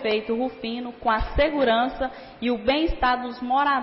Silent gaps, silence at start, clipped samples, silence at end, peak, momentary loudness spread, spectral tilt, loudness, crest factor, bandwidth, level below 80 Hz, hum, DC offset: none; 0 s; under 0.1%; 0 s; -12 dBFS; 9 LU; -9.5 dB/octave; -24 LUFS; 12 dB; 5.8 kHz; -38 dBFS; none; under 0.1%